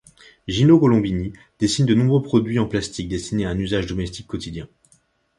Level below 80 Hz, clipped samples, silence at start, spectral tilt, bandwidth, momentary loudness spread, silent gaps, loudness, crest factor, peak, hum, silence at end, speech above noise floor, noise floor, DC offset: -42 dBFS; under 0.1%; 0.5 s; -6.5 dB/octave; 11.5 kHz; 16 LU; none; -20 LUFS; 18 dB; -2 dBFS; none; 0.7 s; 41 dB; -61 dBFS; under 0.1%